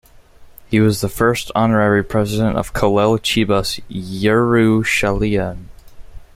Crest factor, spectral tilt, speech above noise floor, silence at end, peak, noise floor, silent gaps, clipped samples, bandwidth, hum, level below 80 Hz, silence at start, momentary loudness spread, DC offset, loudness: 16 dB; -5.5 dB/octave; 27 dB; 0.15 s; -2 dBFS; -42 dBFS; none; under 0.1%; 16 kHz; none; -36 dBFS; 0.4 s; 7 LU; under 0.1%; -16 LUFS